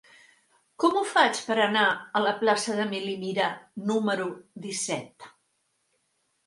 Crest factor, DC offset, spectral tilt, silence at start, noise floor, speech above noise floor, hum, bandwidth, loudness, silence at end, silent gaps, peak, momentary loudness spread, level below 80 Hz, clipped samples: 22 dB; under 0.1%; -3 dB/octave; 0.8 s; -74 dBFS; 47 dB; none; 11.5 kHz; -26 LUFS; 1.2 s; none; -6 dBFS; 12 LU; -78 dBFS; under 0.1%